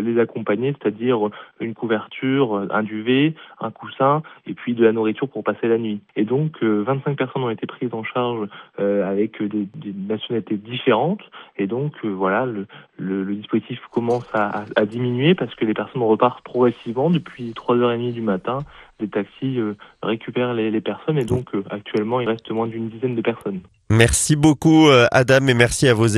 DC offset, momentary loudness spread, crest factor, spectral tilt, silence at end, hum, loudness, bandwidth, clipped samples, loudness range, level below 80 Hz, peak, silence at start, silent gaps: under 0.1%; 13 LU; 20 dB; -5.5 dB/octave; 0 s; none; -20 LUFS; 13 kHz; under 0.1%; 6 LU; -46 dBFS; 0 dBFS; 0 s; none